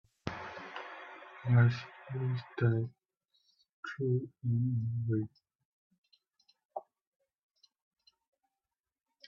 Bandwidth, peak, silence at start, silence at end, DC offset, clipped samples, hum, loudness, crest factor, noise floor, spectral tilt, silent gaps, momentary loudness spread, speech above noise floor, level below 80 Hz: 6 kHz; -14 dBFS; 0.25 s; 2.45 s; under 0.1%; under 0.1%; none; -34 LUFS; 22 dB; under -90 dBFS; -9 dB/octave; 3.73-3.83 s, 5.55-5.59 s, 5.65-5.90 s, 5.98-6.02 s, 6.65-6.69 s; 19 LU; over 58 dB; -70 dBFS